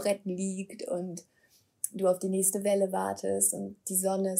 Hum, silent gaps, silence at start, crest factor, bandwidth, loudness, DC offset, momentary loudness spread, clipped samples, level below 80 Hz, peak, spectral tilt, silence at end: none; none; 0 s; 20 dB; 16 kHz; -30 LUFS; under 0.1%; 10 LU; under 0.1%; -80 dBFS; -10 dBFS; -4.5 dB/octave; 0 s